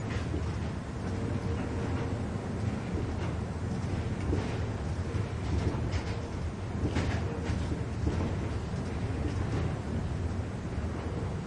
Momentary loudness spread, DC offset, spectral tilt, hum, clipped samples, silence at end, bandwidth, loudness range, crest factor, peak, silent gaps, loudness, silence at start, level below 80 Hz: 4 LU; under 0.1%; -7 dB/octave; none; under 0.1%; 0 s; 10.5 kHz; 1 LU; 14 dB; -18 dBFS; none; -34 LUFS; 0 s; -42 dBFS